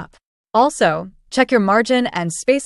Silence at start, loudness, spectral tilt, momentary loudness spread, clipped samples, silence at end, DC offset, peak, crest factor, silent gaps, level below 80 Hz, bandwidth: 0 s; -17 LUFS; -4.5 dB/octave; 7 LU; under 0.1%; 0 s; under 0.1%; -2 dBFS; 16 dB; 0.25-0.44 s; -54 dBFS; 12 kHz